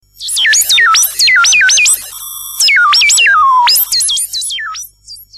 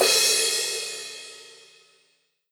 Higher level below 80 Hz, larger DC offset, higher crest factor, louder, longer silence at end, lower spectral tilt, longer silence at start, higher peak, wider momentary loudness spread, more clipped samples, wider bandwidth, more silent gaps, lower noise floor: first, -50 dBFS vs -86 dBFS; neither; second, 10 dB vs 22 dB; first, -7 LUFS vs -21 LUFS; second, 0 s vs 1 s; second, 5 dB/octave vs 1.5 dB/octave; first, 0.2 s vs 0 s; first, -2 dBFS vs -6 dBFS; second, 16 LU vs 23 LU; neither; second, 14.5 kHz vs over 20 kHz; neither; second, -35 dBFS vs -68 dBFS